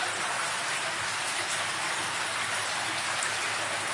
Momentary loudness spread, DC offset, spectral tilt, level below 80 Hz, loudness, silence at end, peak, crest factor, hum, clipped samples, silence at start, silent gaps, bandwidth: 1 LU; under 0.1%; 0 dB/octave; -74 dBFS; -29 LUFS; 0 s; -12 dBFS; 18 dB; none; under 0.1%; 0 s; none; 11.5 kHz